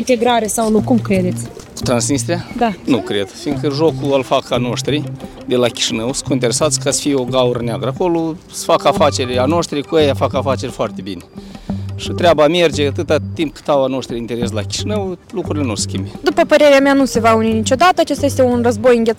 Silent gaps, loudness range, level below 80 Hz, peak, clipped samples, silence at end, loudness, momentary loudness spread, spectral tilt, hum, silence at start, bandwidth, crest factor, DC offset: none; 4 LU; -42 dBFS; -2 dBFS; under 0.1%; 0 s; -15 LUFS; 11 LU; -4.5 dB/octave; none; 0 s; 17 kHz; 14 dB; under 0.1%